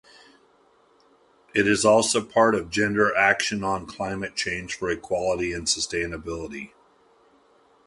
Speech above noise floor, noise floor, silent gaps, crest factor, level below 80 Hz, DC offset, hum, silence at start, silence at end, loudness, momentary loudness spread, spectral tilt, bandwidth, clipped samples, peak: 36 dB; -60 dBFS; none; 20 dB; -52 dBFS; under 0.1%; none; 1.55 s; 1.2 s; -23 LUFS; 13 LU; -3 dB/octave; 11.5 kHz; under 0.1%; -4 dBFS